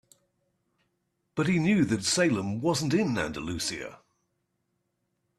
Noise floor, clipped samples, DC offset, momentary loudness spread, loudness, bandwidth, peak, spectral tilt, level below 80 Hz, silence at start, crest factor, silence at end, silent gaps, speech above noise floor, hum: -78 dBFS; under 0.1%; under 0.1%; 9 LU; -27 LUFS; 13.5 kHz; -12 dBFS; -4.5 dB/octave; -60 dBFS; 1.35 s; 18 dB; 1.45 s; none; 51 dB; none